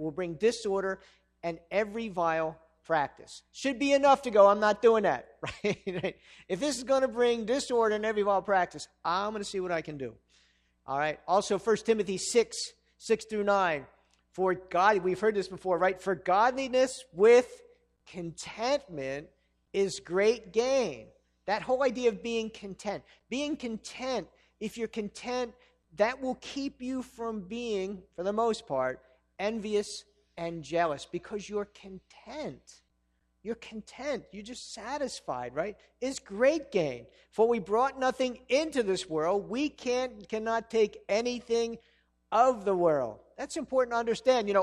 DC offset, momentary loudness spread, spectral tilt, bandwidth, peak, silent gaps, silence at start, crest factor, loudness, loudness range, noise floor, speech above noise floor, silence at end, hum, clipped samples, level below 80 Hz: under 0.1%; 15 LU; -4 dB/octave; 12 kHz; -8 dBFS; none; 0 s; 22 dB; -30 LUFS; 10 LU; -74 dBFS; 45 dB; 0 s; none; under 0.1%; -64 dBFS